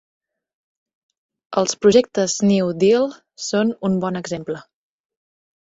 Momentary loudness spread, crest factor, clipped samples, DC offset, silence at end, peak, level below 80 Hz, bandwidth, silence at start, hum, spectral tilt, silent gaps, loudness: 13 LU; 20 dB; under 0.1%; under 0.1%; 1 s; -2 dBFS; -60 dBFS; 8 kHz; 1.5 s; none; -5 dB/octave; none; -19 LUFS